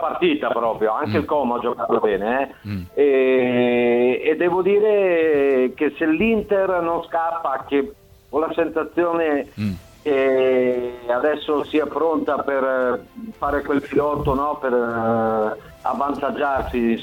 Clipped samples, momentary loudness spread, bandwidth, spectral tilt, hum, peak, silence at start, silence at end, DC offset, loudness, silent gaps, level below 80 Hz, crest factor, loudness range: under 0.1%; 7 LU; 16.5 kHz; -7.5 dB/octave; none; -6 dBFS; 0 s; 0 s; under 0.1%; -20 LUFS; none; -46 dBFS; 14 dB; 4 LU